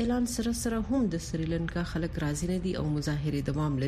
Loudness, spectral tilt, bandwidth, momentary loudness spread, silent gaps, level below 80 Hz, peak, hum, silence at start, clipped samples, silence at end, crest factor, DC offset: -31 LUFS; -6 dB/octave; 15 kHz; 3 LU; none; -42 dBFS; -18 dBFS; none; 0 s; under 0.1%; 0 s; 12 dB; under 0.1%